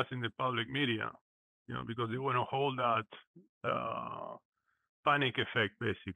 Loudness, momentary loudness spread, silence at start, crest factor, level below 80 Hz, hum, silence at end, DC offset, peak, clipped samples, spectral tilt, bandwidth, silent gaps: -35 LUFS; 12 LU; 0 s; 20 dB; -72 dBFS; none; 0 s; under 0.1%; -16 dBFS; under 0.1%; -7 dB/octave; 9.8 kHz; 1.21-1.66 s, 3.27-3.34 s, 3.49-3.61 s, 4.45-4.52 s, 4.89-5.03 s